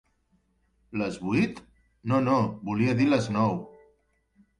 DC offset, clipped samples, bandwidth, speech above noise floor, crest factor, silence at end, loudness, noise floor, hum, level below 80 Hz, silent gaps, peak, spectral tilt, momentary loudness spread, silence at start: under 0.1%; under 0.1%; 11 kHz; 44 dB; 16 dB; 0.9 s; -26 LUFS; -69 dBFS; none; -58 dBFS; none; -12 dBFS; -7 dB/octave; 13 LU; 0.9 s